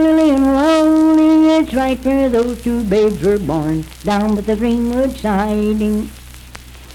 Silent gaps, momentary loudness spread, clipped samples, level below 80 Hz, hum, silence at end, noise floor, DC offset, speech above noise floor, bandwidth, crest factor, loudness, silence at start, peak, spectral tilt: none; 8 LU; under 0.1%; -34 dBFS; none; 0 s; -36 dBFS; under 0.1%; 20 dB; 15.5 kHz; 10 dB; -15 LUFS; 0 s; -4 dBFS; -6.5 dB/octave